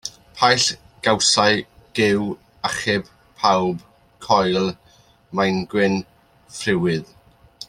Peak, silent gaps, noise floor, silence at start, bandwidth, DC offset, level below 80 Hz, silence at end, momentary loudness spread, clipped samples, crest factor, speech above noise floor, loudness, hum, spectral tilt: -2 dBFS; none; -47 dBFS; 0.05 s; 13.5 kHz; under 0.1%; -54 dBFS; 0.05 s; 13 LU; under 0.1%; 20 dB; 28 dB; -20 LUFS; none; -3.5 dB/octave